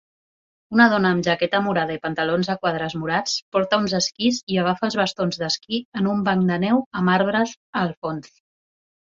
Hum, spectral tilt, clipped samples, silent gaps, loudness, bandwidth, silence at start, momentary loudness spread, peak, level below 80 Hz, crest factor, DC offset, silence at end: none; -5 dB/octave; under 0.1%; 3.42-3.52 s, 4.43-4.47 s, 5.85-5.92 s, 6.86-6.91 s, 7.57-7.73 s, 7.97-8.02 s; -21 LUFS; 7.6 kHz; 0.7 s; 7 LU; -2 dBFS; -60 dBFS; 20 dB; under 0.1%; 0.8 s